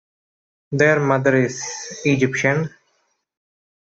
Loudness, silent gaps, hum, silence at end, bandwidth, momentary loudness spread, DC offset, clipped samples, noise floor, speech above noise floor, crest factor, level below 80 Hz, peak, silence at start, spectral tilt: -19 LUFS; none; none; 1.1 s; 8 kHz; 12 LU; under 0.1%; under 0.1%; -68 dBFS; 49 dB; 18 dB; -60 dBFS; -4 dBFS; 0.7 s; -5.5 dB/octave